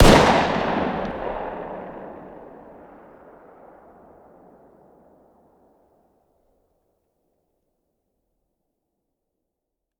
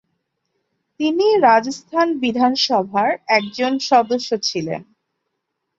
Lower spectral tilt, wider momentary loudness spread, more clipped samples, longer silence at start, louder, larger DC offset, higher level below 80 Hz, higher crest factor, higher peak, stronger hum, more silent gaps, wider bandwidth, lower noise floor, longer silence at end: about the same, -5 dB/octave vs -4 dB/octave; first, 29 LU vs 9 LU; neither; second, 0 s vs 1 s; second, -21 LUFS vs -18 LUFS; neither; first, -34 dBFS vs -64 dBFS; first, 26 dB vs 18 dB; about the same, 0 dBFS vs -2 dBFS; neither; neither; first, 18 kHz vs 8 kHz; first, -82 dBFS vs -76 dBFS; first, 7.5 s vs 0.95 s